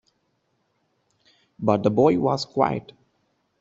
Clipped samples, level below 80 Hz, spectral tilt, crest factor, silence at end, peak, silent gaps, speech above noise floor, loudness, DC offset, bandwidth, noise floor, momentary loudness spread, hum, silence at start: under 0.1%; -62 dBFS; -6 dB/octave; 22 dB; 0.8 s; -4 dBFS; none; 50 dB; -22 LUFS; under 0.1%; 8 kHz; -71 dBFS; 8 LU; none; 1.6 s